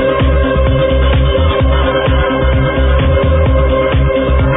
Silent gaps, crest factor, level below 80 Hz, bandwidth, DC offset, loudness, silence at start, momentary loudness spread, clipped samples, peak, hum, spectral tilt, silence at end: none; 10 dB; -14 dBFS; 3.9 kHz; under 0.1%; -12 LUFS; 0 s; 1 LU; under 0.1%; -2 dBFS; none; -11 dB/octave; 0 s